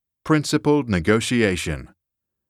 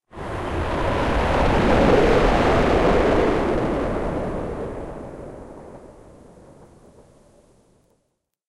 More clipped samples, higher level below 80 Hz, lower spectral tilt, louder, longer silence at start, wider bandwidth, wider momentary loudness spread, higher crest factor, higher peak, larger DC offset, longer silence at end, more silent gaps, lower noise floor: neither; second, -44 dBFS vs -30 dBFS; about the same, -5.5 dB/octave vs -6.5 dB/octave; about the same, -20 LUFS vs -20 LUFS; first, 0.25 s vs 0.1 s; first, 14.5 kHz vs 12.5 kHz; second, 8 LU vs 21 LU; about the same, 18 dB vs 16 dB; about the same, -4 dBFS vs -6 dBFS; neither; second, 0.65 s vs 1 s; neither; first, -82 dBFS vs -73 dBFS